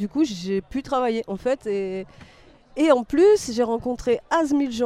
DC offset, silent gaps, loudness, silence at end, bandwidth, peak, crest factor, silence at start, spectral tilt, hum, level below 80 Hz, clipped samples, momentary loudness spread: under 0.1%; none; -22 LUFS; 0 s; 13.5 kHz; -4 dBFS; 18 dB; 0 s; -5 dB/octave; none; -50 dBFS; under 0.1%; 10 LU